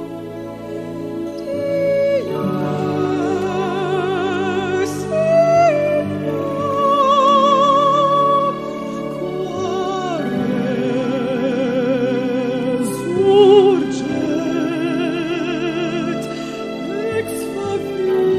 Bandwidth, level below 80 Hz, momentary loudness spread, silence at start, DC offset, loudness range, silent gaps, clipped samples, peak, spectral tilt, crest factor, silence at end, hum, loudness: 14 kHz; -54 dBFS; 13 LU; 0 s; under 0.1%; 6 LU; none; under 0.1%; 0 dBFS; -6 dB/octave; 16 dB; 0 s; none; -18 LUFS